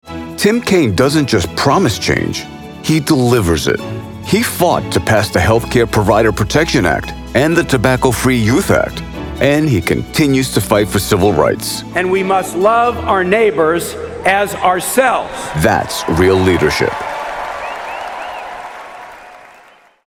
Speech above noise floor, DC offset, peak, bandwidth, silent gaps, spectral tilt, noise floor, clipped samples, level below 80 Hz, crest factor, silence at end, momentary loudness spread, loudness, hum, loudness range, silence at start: 32 dB; under 0.1%; 0 dBFS; 19.5 kHz; none; -5 dB/octave; -45 dBFS; under 0.1%; -34 dBFS; 14 dB; 0.6 s; 12 LU; -14 LUFS; none; 3 LU; 0.05 s